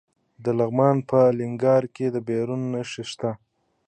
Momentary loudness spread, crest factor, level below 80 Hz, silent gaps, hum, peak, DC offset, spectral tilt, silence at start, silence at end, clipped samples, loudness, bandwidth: 11 LU; 18 dB; -66 dBFS; none; none; -4 dBFS; under 0.1%; -7.5 dB/octave; 0.4 s; 0.5 s; under 0.1%; -23 LUFS; 9 kHz